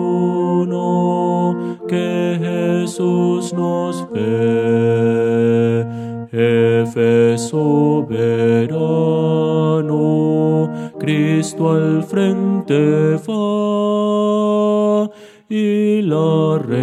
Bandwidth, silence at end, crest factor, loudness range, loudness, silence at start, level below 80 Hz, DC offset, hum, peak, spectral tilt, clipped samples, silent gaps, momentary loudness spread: 12.5 kHz; 0 s; 14 dB; 2 LU; -16 LUFS; 0 s; -64 dBFS; under 0.1%; none; -2 dBFS; -7.5 dB/octave; under 0.1%; none; 5 LU